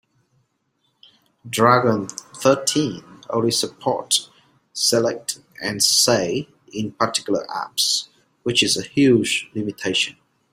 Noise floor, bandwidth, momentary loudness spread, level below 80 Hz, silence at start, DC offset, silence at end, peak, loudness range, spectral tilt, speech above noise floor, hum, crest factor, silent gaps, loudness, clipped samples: -69 dBFS; 16 kHz; 13 LU; -60 dBFS; 1.45 s; under 0.1%; 0.4 s; 0 dBFS; 2 LU; -3 dB/octave; 49 dB; none; 20 dB; none; -20 LUFS; under 0.1%